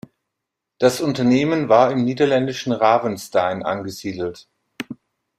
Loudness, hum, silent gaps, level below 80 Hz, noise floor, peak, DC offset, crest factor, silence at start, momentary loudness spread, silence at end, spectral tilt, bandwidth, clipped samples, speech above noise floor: -19 LUFS; none; none; -60 dBFS; -81 dBFS; -2 dBFS; under 0.1%; 18 dB; 0.8 s; 17 LU; 0.45 s; -5.5 dB/octave; 14.5 kHz; under 0.1%; 63 dB